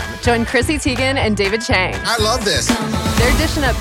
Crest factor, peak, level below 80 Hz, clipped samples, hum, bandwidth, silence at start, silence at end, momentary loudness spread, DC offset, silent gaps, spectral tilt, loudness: 14 dB; -2 dBFS; -26 dBFS; under 0.1%; none; 16.5 kHz; 0 s; 0 s; 3 LU; under 0.1%; none; -4 dB/octave; -16 LUFS